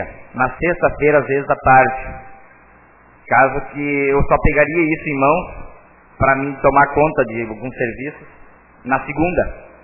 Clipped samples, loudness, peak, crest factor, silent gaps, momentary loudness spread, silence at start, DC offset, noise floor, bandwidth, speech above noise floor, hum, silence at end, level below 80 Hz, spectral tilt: under 0.1%; -16 LUFS; 0 dBFS; 16 dB; none; 14 LU; 0 s; under 0.1%; -47 dBFS; 2.9 kHz; 31 dB; none; 0.15 s; -34 dBFS; -11 dB/octave